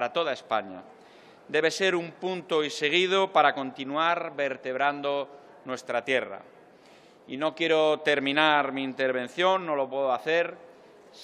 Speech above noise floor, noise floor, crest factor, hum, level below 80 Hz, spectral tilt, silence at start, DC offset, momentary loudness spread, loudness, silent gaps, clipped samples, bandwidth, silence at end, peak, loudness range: 28 dB; -54 dBFS; 22 dB; none; -82 dBFS; -3.5 dB/octave; 0 s; under 0.1%; 11 LU; -26 LUFS; none; under 0.1%; 12.5 kHz; 0 s; -6 dBFS; 4 LU